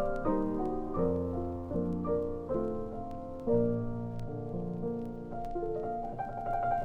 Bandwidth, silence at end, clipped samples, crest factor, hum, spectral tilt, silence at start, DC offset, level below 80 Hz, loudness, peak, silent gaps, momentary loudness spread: 5.8 kHz; 0 s; under 0.1%; 16 dB; none; -10.5 dB/octave; 0 s; under 0.1%; -46 dBFS; -35 LUFS; -16 dBFS; none; 7 LU